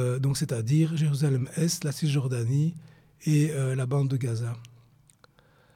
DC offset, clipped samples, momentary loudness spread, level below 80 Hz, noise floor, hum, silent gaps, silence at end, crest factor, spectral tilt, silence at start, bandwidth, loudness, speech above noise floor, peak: under 0.1%; under 0.1%; 7 LU; -64 dBFS; -61 dBFS; none; none; 1.1 s; 14 dB; -6.5 dB/octave; 0 s; 15.5 kHz; -27 LUFS; 35 dB; -14 dBFS